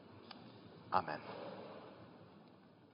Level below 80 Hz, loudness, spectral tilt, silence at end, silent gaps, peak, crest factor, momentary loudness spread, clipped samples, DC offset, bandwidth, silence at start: -84 dBFS; -45 LUFS; -3.5 dB/octave; 0 s; none; -16 dBFS; 30 dB; 23 LU; under 0.1%; under 0.1%; 5.2 kHz; 0 s